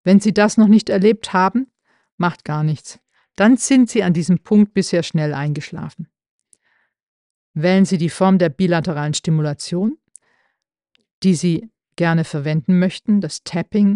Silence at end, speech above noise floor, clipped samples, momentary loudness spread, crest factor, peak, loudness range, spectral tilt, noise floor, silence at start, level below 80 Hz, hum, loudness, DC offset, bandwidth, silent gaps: 0 s; 56 dB; under 0.1%; 12 LU; 16 dB; -2 dBFS; 5 LU; -6 dB/octave; -72 dBFS; 0.05 s; -58 dBFS; none; -17 LUFS; under 0.1%; 11 kHz; 2.12-2.18 s, 6.29-6.39 s, 7.03-7.54 s, 11.13-11.22 s